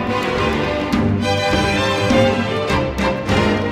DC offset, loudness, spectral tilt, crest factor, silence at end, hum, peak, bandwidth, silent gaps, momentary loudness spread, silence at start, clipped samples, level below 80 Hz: under 0.1%; -17 LUFS; -5.5 dB/octave; 14 dB; 0 s; none; -2 dBFS; 15.5 kHz; none; 4 LU; 0 s; under 0.1%; -32 dBFS